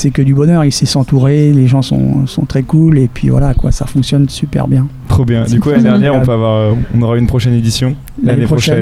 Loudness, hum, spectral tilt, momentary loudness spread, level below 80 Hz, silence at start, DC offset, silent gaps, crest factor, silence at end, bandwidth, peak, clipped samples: -11 LUFS; none; -7 dB/octave; 6 LU; -24 dBFS; 0 s; under 0.1%; none; 10 dB; 0 s; 13 kHz; 0 dBFS; under 0.1%